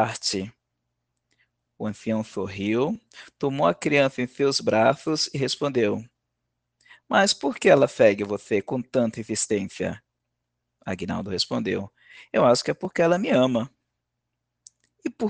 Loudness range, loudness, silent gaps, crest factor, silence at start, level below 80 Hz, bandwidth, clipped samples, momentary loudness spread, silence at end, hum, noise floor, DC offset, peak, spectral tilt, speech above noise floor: 6 LU; -24 LUFS; none; 22 dB; 0 s; -64 dBFS; 10 kHz; under 0.1%; 13 LU; 0 s; 60 Hz at -55 dBFS; -81 dBFS; under 0.1%; -4 dBFS; -4.5 dB/octave; 58 dB